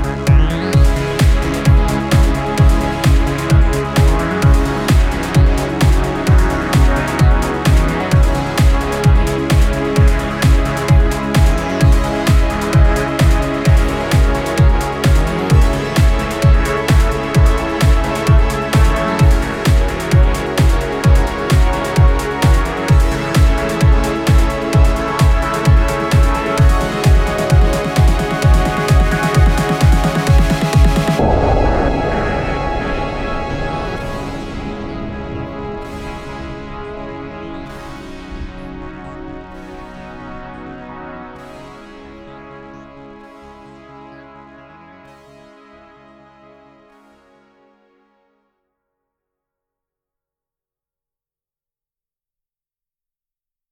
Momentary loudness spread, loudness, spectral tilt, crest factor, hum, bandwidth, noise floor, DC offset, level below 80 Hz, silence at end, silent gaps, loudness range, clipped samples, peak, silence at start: 17 LU; -14 LUFS; -6 dB/octave; 14 dB; none; 15.5 kHz; under -90 dBFS; under 0.1%; -16 dBFS; 9.3 s; none; 16 LU; under 0.1%; 0 dBFS; 0 s